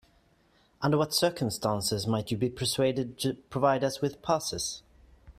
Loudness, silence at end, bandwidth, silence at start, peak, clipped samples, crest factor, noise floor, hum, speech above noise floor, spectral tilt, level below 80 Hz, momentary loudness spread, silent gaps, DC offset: -29 LUFS; 0.05 s; 16 kHz; 0.8 s; -10 dBFS; under 0.1%; 20 dB; -65 dBFS; none; 36 dB; -4.5 dB/octave; -58 dBFS; 7 LU; none; under 0.1%